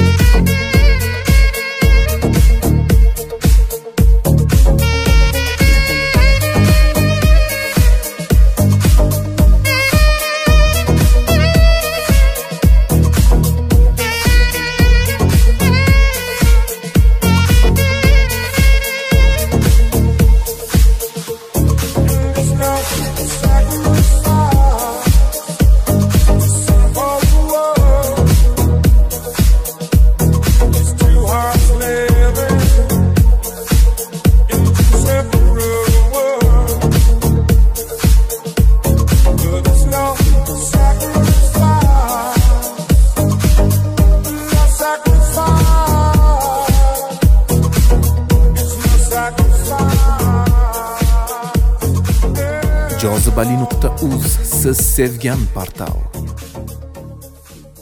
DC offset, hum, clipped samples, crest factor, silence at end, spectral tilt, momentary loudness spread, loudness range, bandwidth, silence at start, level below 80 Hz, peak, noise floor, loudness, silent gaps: under 0.1%; none; under 0.1%; 10 dB; 0.55 s; -5.5 dB/octave; 5 LU; 3 LU; 16 kHz; 0 s; -12 dBFS; 0 dBFS; -38 dBFS; -13 LUFS; none